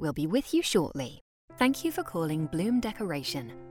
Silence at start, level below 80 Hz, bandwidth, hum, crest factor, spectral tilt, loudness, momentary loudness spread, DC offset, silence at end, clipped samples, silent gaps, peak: 0 s; -56 dBFS; 18.5 kHz; none; 18 dB; -5 dB/octave; -30 LUFS; 8 LU; under 0.1%; 0 s; under 0.1%; 1.21-1.48 s; -10 dBFS